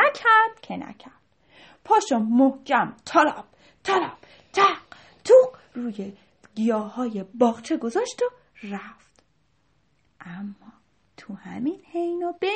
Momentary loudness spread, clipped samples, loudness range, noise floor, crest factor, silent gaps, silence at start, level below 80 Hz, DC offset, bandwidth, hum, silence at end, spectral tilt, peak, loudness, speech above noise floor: 20 LU; under 0.1%; 14 LU; -68 dBFS; 20 dB; none; 0 s; -70 dBFS; under 0.1%; 8.4 kHz; none; 0 s; -4.5 dB/octave; -4 dBFS; -22 LUFS; 45 dB